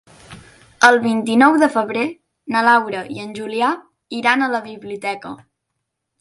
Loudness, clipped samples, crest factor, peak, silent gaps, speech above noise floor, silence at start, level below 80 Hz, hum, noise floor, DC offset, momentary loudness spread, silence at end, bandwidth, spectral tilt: -17 LUFS; under 0.1%; 18 dB; 0 dBFS; none; 60 dB; 0.3 s; -62 dBFS; none; -76 dBFS; under 0.1%; 17 LU; 0.85 s; 11.5 kHz; -4 dB/octave